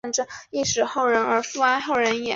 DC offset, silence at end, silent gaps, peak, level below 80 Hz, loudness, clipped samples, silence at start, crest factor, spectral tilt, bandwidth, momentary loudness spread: under 0.1%; 0 s; none; -6 dBFS; -58 dBFS; -22 LUFS; under 0.1%; 0.05 s; 16 dB; -2 dB/octave; 7.8 kHz; 6 LU